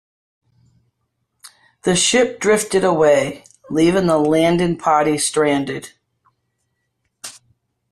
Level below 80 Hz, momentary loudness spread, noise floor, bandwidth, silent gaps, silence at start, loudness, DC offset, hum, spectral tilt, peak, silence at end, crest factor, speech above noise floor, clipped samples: -52 dBFS; 18 LU; -72 dBFS; 14 kHz; none; 1.85 s; -16 LUFS; under 0.1%; none; -4 dB/octave; -2 dBFS; 0.6 s; 16 dB; 56 dB; under 0.1%